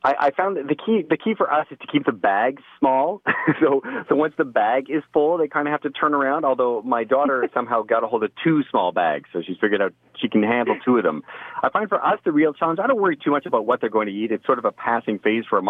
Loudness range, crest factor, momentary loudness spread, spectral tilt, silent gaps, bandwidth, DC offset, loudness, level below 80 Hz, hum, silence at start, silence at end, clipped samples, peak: 1 LU; 16 dB; 5 LU; -8.5 dB/octave; none; 5.2 kHz; under 0.1%; -21 LUFS; -68 dBFS; none; 0.05 s; 0 s; under 0.1%; -6 dBFS